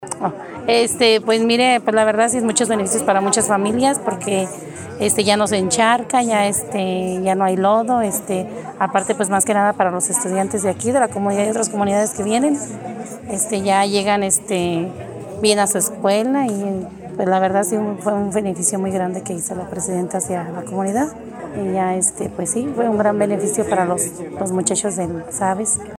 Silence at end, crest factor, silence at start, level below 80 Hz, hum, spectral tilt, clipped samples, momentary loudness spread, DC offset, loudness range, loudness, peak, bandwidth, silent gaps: 0 s; 18 dB; 0 s; -54 dBFS; none; -3.5 dB/octave; under 0.1%; 9 LU; under 0.1%; 5 LU; -18 LUFS; 0 dBFS; 17 kHz; none